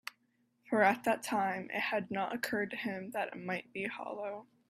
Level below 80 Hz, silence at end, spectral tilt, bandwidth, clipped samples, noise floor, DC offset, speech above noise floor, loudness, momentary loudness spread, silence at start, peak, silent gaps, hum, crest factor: -80 dBFS; 0.25 s; -4.5 dB/octave; 15.5 kHz; under 0.1%; -76 dBFS; under 0.1%; 41 dB; -35 LUFS; 12 LU; 0.05 s; -14 dBFS; none; none; 22 dB